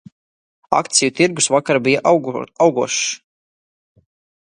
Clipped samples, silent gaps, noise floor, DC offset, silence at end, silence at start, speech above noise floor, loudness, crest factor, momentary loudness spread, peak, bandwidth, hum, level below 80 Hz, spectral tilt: under 0.1%; none; under -90 dBFS; under 0.1%; 1.25 s; 0.7 s; over 74 dB; -16 LUFS; 18 dB; 6 LU; 0 dBFS; 11.5 kHz; none; -62 dBFS; -3 dB/octave